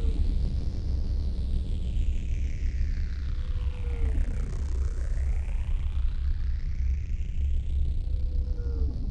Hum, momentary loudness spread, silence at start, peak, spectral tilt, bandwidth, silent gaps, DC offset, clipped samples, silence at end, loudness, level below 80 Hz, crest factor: none; 3 LU; 0 s; -14 dBFS; -7.5 dB/octave; 7.8 kHz; none; under 0.1%; under 0.1%; 0 s; -32 LUFS; -28 dBFS; 12 dB